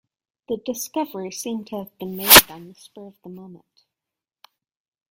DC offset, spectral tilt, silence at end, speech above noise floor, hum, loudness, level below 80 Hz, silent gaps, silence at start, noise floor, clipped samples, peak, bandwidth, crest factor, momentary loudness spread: under 0.1%; -1 dB/octave; 1.55 s; 67 dB; none; -16 LUFS; -50 dBFS; none; 0.5 s; -88 dBFS; under 0.1%; 0 dBFS; 17 kHz; 24 dB; 23 LU